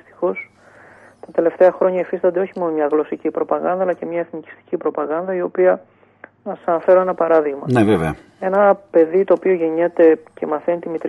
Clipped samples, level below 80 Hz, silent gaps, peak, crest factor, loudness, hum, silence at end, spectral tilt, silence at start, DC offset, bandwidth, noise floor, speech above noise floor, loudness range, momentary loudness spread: under 0.1%; -54 dBFS; none; -2 dBFS; 16 dB; -18 LUFS; 50 Hz at -65 dBFS; 0 s; -8.5 dB/octave; 0.2 s; under 0.1%; 11.5 kHz; -46 dBFS; 29 dB; 5 LU; 11 LU